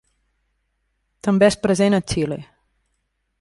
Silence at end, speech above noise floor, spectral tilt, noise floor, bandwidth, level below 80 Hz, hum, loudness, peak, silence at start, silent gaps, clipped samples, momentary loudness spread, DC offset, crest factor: 0.95 s; 54 dB; -5.5 dB/octave; -72 dBFS; 11.5 kHz; -48 dBFS; none; -19 LUFS; -2 dBFS; 1.25 s; none; under 0.1%; 11 LU; under 0.1%; 20 dB